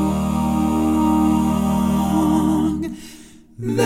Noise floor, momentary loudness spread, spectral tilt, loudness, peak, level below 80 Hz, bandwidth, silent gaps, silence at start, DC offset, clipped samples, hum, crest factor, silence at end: -43 dBFS; 12 LU; -7 dB/octave; -19 LUFS; -4 dBFS; -34 dBFS; 16 kHz; none; 0 s; under 0.1%; under 0.1%; none; 14 dB; 0 s